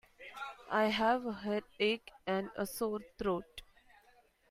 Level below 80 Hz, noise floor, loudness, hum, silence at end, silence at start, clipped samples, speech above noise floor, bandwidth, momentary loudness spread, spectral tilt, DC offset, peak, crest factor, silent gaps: -64 dBFS; -67 dBFS; -36 LUFS; none; 0.9 s; 0.2 s; under 0.1%; 33 dB; 15.5 kHz; 15 LU; -4.5 dB/octave; under 0.1%; -18 dBFS; 18 dB; none